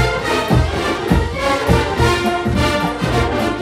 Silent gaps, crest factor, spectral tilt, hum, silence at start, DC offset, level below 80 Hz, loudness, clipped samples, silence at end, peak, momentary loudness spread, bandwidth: none; 16 dB; -5.5 dB/octave; none; 0 s; under 0.1%; -26 dBFS; -17 LUFS; under 0.1%; 0 s; 0 dBFS; 3 LU; 16 kHz